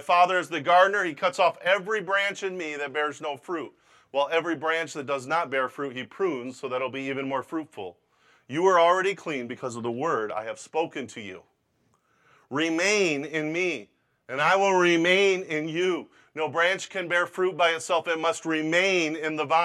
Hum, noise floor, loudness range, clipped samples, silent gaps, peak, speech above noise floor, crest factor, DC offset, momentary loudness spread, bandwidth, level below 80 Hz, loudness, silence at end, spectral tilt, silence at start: none; -69 dBFS; 6 LU; under 0.1%; none; -8 dBFS; 44 dB; 20 dB; under 0.1%; 14 LU; 13 kHz; -82 dBFS; -25 LUFS; 0 s; -3.5 dB/octave; 0 s